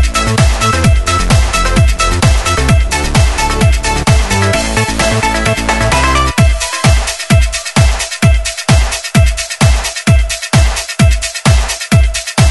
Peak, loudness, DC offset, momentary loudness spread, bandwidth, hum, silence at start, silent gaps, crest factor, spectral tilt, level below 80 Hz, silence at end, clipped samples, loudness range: 0 dBFS; -11 LUFS; under 0.1%; 2 LU; 12 kHz; none; 0 s; none; 10 dB; -4.5 dB/octave; -14 dBFS; 0 s; under 0.1%; 1 LU